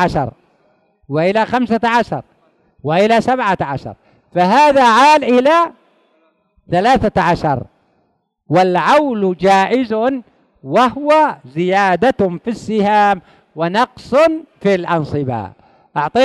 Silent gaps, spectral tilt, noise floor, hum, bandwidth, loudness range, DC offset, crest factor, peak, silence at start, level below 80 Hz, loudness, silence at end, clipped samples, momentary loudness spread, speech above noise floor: none; -6 dB/octave; -63 dBFS; none; 12 kHz; 4 LU; under 0.1%; 12 dB; -2 dBFS; 0 s; -46 dBFS; -14 LUFS; 0 s; under 0.1%; 12 LU; 50 dB